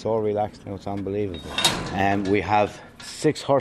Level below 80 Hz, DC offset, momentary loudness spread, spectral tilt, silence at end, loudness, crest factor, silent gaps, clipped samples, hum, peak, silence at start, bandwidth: -50 dBFS; under 0.1%; 10 LU; -4.5 dB/octave; 0 s; -24 LUFS; 22 dB; none; under 0.1%; none; -2 dBFS; 0 s; 13.5 kHz